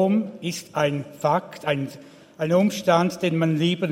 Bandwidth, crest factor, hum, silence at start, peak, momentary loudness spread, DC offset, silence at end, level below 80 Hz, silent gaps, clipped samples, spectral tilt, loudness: 16.5 kHz; 18 dB; none; 0 s; -4 dBFS; 9 LU; under 0.1%; 0 s; -66 dBFS; none; under 0.1%; -6 dB/octave; -23 LUFS